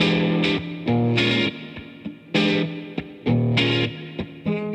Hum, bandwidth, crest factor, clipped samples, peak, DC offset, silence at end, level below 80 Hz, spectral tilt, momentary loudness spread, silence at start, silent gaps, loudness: none; 9 kHz; 16 dB; under 0.1%; -6 dBFS; under 0.1%; 0 s; -52 dBFS; -6.5 dB/octave; 16 LU; 0 s; none; -22 LUFS